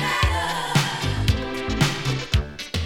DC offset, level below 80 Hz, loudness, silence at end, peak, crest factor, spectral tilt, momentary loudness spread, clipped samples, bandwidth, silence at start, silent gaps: under 0.1%; -30 dBFS; -23 LUFS; 0 s; -6 dBFS; 18 dB; -4.5 dB/octave; 4 LU; under 0.1%; 19 kHz; 0 s; none